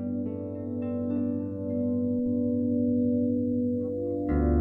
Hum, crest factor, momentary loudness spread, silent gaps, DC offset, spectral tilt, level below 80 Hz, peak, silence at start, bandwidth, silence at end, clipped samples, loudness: none; 14 dB; 7 LU; none; under 0.1%; -13 dB/octave; -40 dBFS; -14 dBFS; 0 s; 2.8 kHz; 0 s; under 0.1%; -28 LUFS